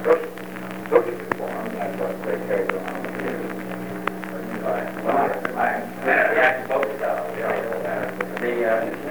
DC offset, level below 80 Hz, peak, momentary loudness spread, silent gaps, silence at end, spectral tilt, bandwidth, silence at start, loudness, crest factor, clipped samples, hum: 0.6%; -66 dBFS; 0 dBFS; 11 LU; none; 0 s; -6 dB/octave; over 20 kHz; 0 s; -24 LUFS; 22 dB; under 0.1%; none